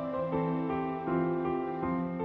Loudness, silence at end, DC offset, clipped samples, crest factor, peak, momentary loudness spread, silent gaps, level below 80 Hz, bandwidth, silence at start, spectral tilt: -32 LUFS; 0 s; under 0.1%; under 0.1%; 14 dB; -18 dBFS; 2 LU; none; -58 dBFS; 4.7 kHz; 0 s; -10.5 dB/octave